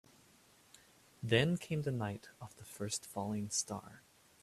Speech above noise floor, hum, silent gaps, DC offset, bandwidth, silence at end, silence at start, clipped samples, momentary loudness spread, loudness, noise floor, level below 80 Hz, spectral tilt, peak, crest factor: 28 dB; none; none; under 0.1%; 14.5 kHz; 0.45 s; 1.2 s; under 0.1%; 19 LU; -37 LUFS; -66 dBFS; -70 dBFS; -4.5 dB/octave; -16 dBFS; 24 dB